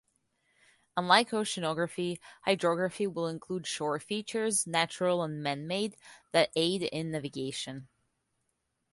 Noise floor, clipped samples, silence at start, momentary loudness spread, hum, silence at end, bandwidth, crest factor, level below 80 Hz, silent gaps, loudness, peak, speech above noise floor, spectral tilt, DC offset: -80 dBFS; under 0.1%; 0.95 s; 11 LU; none; 1.05 s; 12 kHz; 26 dB; -72 dBFS; none; -31 LUFS; -6 dBFS; 49 dB; -3.5 dB/octave; under 0.1%